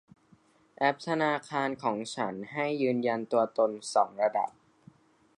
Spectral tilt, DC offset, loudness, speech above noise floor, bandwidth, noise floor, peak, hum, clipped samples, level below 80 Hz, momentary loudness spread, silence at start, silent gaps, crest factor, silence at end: -5 dB/octave; under 0.1%; -30 LUFS; 34 dB; 11 kHz; -63 dBFS; -10 dBFS; none; under 0.1%; -80 dBFS; 6 LU; 0.8 s; none; 20 dB; 0.9 s